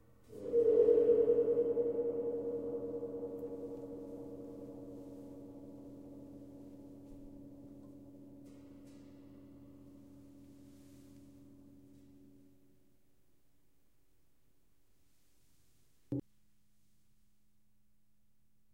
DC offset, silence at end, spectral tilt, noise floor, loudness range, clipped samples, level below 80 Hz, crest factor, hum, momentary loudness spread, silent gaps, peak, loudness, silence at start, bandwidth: under 0.1%; 2.55 s; -9 dB/octave; -78 dBFS; 26 LU; under 0.1%; -70 dBFS; 22 dB; none; 28 LU; none; -18 dBFS; -34 LUFS; 0.3 s; 3.3 kHz